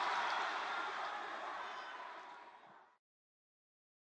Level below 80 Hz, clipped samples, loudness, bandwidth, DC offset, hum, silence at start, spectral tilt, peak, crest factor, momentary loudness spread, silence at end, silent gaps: under -90 dBFS; under 0.1%; -42 LUFS; 9.6 kHz; under 0.1%; none; 0 s; -0.5 dB/octave; -28 dBFS; 18 dB; 20 LU; 1.25 s; none